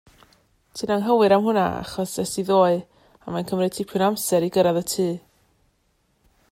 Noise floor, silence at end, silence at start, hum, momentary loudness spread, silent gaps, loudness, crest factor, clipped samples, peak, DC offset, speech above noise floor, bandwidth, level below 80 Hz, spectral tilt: -67 dBFS; 1.35 s; 0.75 s; none; 13 LU; none; -22 LUFS; 18 dB; under 0.1%; -6 dBFS; under 0.1%; 46 dB; 16 kHz; -58 dBFS; -5 dB/octave